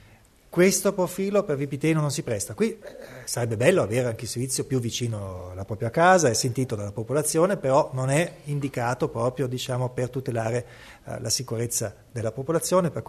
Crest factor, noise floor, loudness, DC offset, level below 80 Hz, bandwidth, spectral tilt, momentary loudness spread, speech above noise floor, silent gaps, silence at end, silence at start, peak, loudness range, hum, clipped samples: 20 dB; -54 dBFS; -25 LUFS; under 0.1%; -56 dBFS; 13.5 kHz; -5 dB/octave; 11 LU; 29 dB; none; 0.05 s; 0.5 s; -4 dBFS; 5 LU; none; under 0.1%